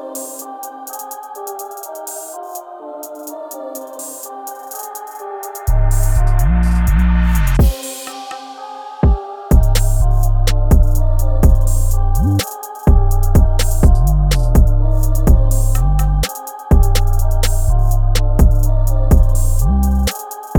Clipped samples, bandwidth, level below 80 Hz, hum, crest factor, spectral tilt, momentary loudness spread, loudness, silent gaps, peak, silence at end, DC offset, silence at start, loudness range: under 0.1%; 18.5 kHz; -14 dBFS; none; 12 dB; -6 dB/octave; 15 LU; -16 LUFS; none; 0 dBFS; 0 s; under 0.1%; 0 s; 13 LU